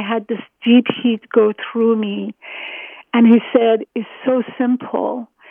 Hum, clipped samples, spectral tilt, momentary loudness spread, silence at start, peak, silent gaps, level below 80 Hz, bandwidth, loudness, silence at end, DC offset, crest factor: none; under 0.1%; -9.5 dB/octave; 16 LU; 0 s; 0 dBFS; none; -74 dBFS; 3.6 kHz; -17 LUFS; 0.25 s; under 0.1%; 16 dB